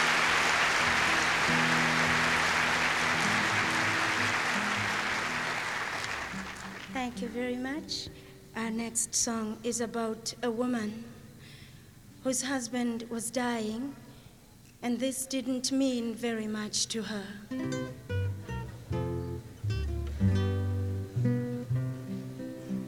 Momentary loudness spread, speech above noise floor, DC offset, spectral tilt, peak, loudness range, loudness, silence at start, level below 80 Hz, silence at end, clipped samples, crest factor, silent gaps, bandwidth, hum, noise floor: 14 LU; 22 dB; under 0.1%; -3.5 dB/octave; -12 dBFS; 9 LU; -30 LUFS; 0 s; -50 dBFS; 0 s; under 0.1%; 18 dB; none; 17.5 kHz; none; -55 dBFS